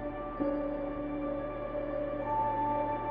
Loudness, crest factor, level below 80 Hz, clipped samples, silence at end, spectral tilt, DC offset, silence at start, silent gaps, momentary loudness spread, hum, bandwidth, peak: -34 LUFS; 14 dB; -50 dBFS; under 0.1%; 0 s; -6.5 dB/octave; under 0.1%; 0 s; none; 6 LU; none; 5 kHz; -20 dBFS